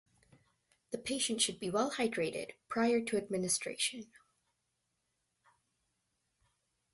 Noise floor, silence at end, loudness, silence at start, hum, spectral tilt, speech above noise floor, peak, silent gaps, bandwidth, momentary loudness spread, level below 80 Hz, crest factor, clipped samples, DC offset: -83 dBFS; 2.9 s; -34 LUFS; 0.9 s; none; -2.5 dB/octave; 48 dB; -18 dBFS; none; 12 kHz; 10 LU; -74 dBFS; 20 dB; under 0.1%; under 0.1%